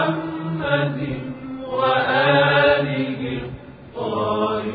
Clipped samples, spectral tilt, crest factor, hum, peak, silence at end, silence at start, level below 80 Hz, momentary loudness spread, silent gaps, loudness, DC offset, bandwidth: under 0.1%; -9.5 dB/octave; 16 dB; none; -4 dBFS; 0 s; 0 s; -50 dBFS; 16 LU; none; -20 LUFS; under 0.1%; 5 kHz